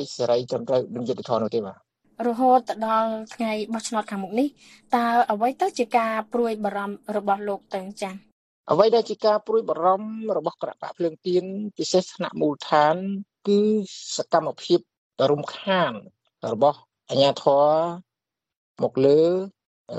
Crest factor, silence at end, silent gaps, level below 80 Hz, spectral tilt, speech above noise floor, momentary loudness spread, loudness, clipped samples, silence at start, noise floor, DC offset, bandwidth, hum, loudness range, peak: 20 dB; 0 s; 8.32-8.64 s, 14.97-15.11 s, 18.56-18.75 s, 19.65-19.85 s; -70 dBFS; -5 dB/octave; 64 dB; 12 LU; -23 LUFS; under 0.1%; 0 s; -87 dBFS; under 0.1%; 13.5 kHz; none; 2 LU; -2 dBFS